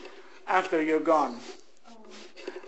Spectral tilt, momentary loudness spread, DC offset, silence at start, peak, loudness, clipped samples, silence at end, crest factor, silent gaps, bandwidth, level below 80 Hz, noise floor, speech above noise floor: -4.5 dB/octave; 23 LU; 0.4%; 0 s; -10 dBFS; -26 LUFS; under 0.1%; 0 s; 20 dB; none; 8.4 kHz; -80 dBFS; -54 dBFS; 28 dB